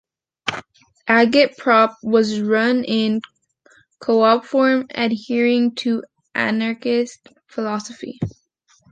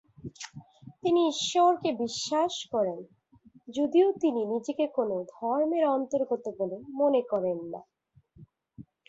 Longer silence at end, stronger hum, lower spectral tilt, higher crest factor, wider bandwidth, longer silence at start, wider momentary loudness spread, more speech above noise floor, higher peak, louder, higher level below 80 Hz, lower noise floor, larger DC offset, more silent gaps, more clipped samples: first, 0.6 s vs 0.25 s; neither; about the same, -5 dB/octave vs -4.5 dB/octave; about the same, 18 dB vs 16 dB; first, 9 kHz vs 8 kHz; first, 0.45 s vs 0.25 s; second, 13 LU vs 17 LU; first, 42 dB vs 32 dB; first, -2 dBFS vs -12 dBFS; first, -19 LUFS vs -28 LUFS; first, -58 dBFS vs -72 dBFS; about the same, -60 dBFS vs -60 dBFS; neither; neither; neither